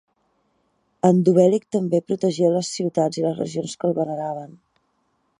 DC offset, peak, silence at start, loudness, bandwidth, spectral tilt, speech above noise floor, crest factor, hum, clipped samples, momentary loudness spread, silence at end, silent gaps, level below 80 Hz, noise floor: under 0.1%; -2 dBFS; 1.05 s; -21 LUFS; 11 kHz; -7 dB/octave; 48 dB; 20 dB; none; under 0.1%; 11 LU; 0.85 s; none; -68 dBFS; -69 dBFS